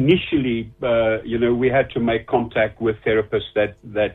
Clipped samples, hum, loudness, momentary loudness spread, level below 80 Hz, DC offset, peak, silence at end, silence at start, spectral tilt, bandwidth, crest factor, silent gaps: under 0.1%; none; -20 LUFS; 5 LU; -44 dBFS; under 0.1%; -4 dBFS; 0 s; 0 s; -9 dB/octave; 4.1 kHz; 16 dB; none